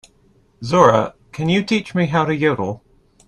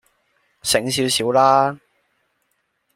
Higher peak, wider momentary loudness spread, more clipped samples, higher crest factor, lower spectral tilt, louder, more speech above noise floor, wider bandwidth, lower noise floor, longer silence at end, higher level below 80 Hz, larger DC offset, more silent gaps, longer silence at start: about the same, 0 dBFS vs -2 dBFS; first, 14 LU vs 11 LU; neither; about the same, 18 dB vs 18 dB; first, -6.5 dB/octave vs -3 dB/octave; about the same, -18 LUFS vs -18 LUFS; second, 39 dB vs 53 dB; second, 11 kHz vs 16 kHz; second, -56 dBFS vs -70 dBFS; second, 0.5 s vs 1.2 s; first, -52 dBFS vs -58 dBFS; neither; neither; about the same, 0.6 s vs 0.65 s